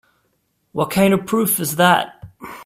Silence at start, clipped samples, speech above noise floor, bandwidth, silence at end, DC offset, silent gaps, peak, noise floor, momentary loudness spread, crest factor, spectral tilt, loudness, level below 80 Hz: 0.75 s; under 0.1%; 50 dB; 16 kHz; 0 s; under 0.1%; none; 0 dBFS; -67 dBFS; 17 LU; 18 dB; -4.5 dB/octave; -17 LUFS; -54 dBFS